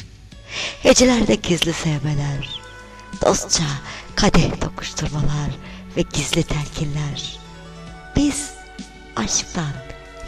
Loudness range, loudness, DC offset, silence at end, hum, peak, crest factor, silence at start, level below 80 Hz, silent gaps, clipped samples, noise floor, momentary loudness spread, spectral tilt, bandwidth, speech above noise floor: 6 LU; -20 LUFS; under 0.1%; 0 s; none; -4 dBFS; 18 dB; 0 s; -32 dBFS; none; under 0.1%; -40 dBFS; 21 LU; -4 dB/octave; 14 kHz; 20 dB